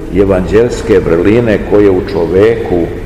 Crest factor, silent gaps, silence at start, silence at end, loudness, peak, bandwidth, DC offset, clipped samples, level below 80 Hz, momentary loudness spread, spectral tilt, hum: 10 dB; none; 0 s; 0 s; -10 LUFS; 0 dBFS; 12 kHz; 0.8%; 2%; -24 dBFS; 4 LU; -7.5 dB/octave; none